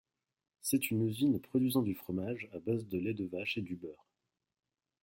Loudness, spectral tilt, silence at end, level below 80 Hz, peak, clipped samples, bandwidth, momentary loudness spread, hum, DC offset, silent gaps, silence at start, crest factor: -35 LUFS; -5.5 dB/octave; 1.1 s; -74 dBFS; -18 dBFS; under 0.1%; 16.5 kHz; 9 LU; none; under 0.1%; none; 0.65 s; 18 dB